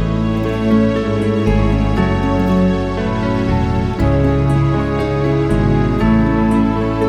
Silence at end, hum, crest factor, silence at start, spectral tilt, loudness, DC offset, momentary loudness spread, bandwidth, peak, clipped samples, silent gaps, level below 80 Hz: 0 s; none; 12 dB; 0 s; -8.5 dB/octave; -15 LUFS; under 0.1%; 3 LU; 10.5 kHz; -2 dBFS; under 0.1%; none; -24 dBFS